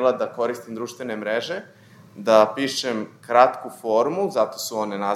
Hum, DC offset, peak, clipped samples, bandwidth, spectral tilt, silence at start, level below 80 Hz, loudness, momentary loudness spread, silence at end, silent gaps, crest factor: none; under 0.1%; -2 dBFS; under 0.1%; 16 kHz; -4 dB/octave; 0 s; -80 dBFS; -22 LUFS; 14 LU; 0 s; none; 22 dB